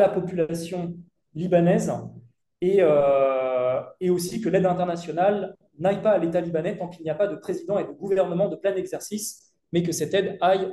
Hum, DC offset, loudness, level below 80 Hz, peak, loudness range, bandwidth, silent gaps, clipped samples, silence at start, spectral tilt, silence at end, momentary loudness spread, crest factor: none; under 0.1%; -24 LUFS; -62 dBFS; -6 dBFS; 4 LU; 12.5 kHz; none; under 0.1%; 0 s; -6 dB/octave; 0 s; 12 LU; 18 dB